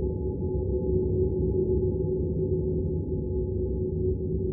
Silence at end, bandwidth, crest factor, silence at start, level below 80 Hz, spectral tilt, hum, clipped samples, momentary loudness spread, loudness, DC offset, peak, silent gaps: 0 s; 1 kHz; 12 dB; 0 s; -34 dBFS; -10.5 dB/octave; none; under 0.1%; 4 LU; -28 LUFS; under 0.1%; -14 dBFS; none